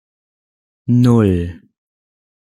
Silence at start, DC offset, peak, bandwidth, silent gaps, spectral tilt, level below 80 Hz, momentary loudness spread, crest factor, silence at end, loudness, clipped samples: 0.85 s; under 0.1%; -2 dBFS; 11.5 kHz; none; -9 dB/octave; -48 dBFS; 16 LU; 16 dB; 1.05 s; -14 LUFS; under 0.1%